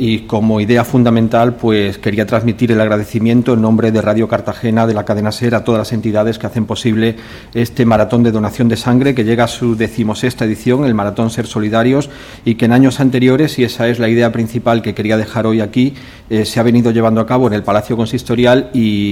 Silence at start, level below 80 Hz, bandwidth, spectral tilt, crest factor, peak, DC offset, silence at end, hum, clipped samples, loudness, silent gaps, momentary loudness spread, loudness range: 0 s; -42 dBFS; 16 kHz; -7 dB/octave; 12 dB; 0 dBFS; under 0.1%; 0 s; none; under 0.1%; -13 LUFS; none; 6 LU; 2 LU